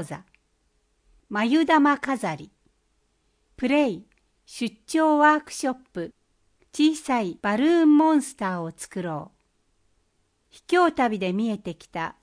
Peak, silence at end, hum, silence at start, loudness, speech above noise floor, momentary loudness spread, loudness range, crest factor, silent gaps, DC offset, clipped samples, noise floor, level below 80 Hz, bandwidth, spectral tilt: -6 dBFS; 0.1 s; none; 0 s; -23 LUFS; 46 dB; 17 LU; 4 LU; 18 dB; none; under 0.1%; under 0.1%; -69 dBFS; -64 dBFS; 10.5 kHz; -5 dB/octave